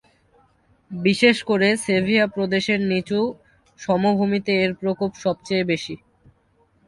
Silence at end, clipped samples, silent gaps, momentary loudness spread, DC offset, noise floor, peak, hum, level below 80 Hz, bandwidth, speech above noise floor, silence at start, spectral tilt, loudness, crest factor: 0.9 s; under 0.1%; none; 9 LU; under 0.1%; -62 dBFS; -2 dBFS; none; -58 dBFS; 11.5 kHz; 41 dB; 0.9 s; -5.5 dB/octave; -21 LUFS; 20 dB